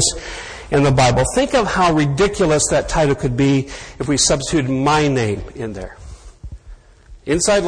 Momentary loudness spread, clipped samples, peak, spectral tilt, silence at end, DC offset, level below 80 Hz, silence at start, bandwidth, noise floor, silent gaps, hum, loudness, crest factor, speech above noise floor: 14 LU; under 0.1%; -2 dBFS; -4.5 dB/octave; 0 s; under 0.1%; -34 dBFS; 0 s; 10.5 kHz; -43 dBFS; none; none; -16 LUFS; 16 dB; 26 dB